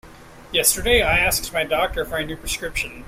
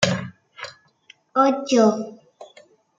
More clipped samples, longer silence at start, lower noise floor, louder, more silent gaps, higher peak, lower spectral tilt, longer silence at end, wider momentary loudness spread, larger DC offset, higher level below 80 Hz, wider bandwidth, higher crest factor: neither; about the same, 0.05 s vs 0 s; second, -43 dBFS vs -55 dBFS; about the same, -20 LUFS vs -20 LUFS; neither; about the same, -2 dBFS vs -2 dBFS; second, -2 dB/octave vs -5 dB/octave; second, 0 s vs 0.55 s; second, 10 LU vs 20 LU; neither; first, -34 dBFS vs -66 dBFS; first, 16 kHz vs 9.4 kHz; about the same, 20 dB vs 22 dB